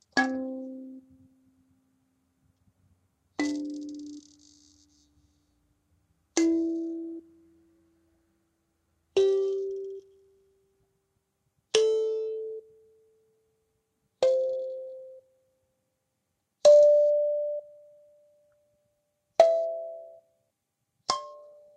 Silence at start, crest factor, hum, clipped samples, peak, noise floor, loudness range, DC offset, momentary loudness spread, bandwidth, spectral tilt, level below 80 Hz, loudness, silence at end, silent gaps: 0.15 s; 24 dB; none; under 0.1%; -6 dBFS; -81 dBFS; 14 LU; under 0.1%; 22 LU; 10 kHz; -2.5 dB/octave; -76 dBFS; -26 LUFS; 0.35 s; none